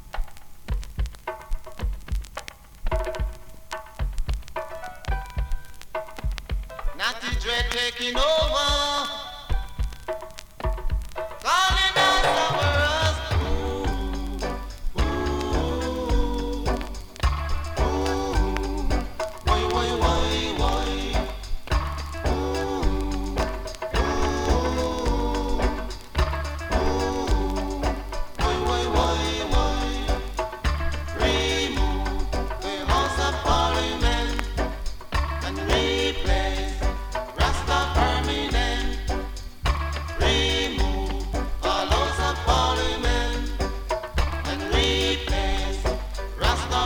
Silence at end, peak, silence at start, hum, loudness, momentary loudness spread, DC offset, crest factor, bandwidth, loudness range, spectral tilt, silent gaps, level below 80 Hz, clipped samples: 0 s; -4 dBFS; 0 s; none; -25 LUFS; 12 LU; under 0.1%; 20 dB; 18 kHz; 8 LU; -4.5 dB/octave; none; -28 dBFS; under 0.1%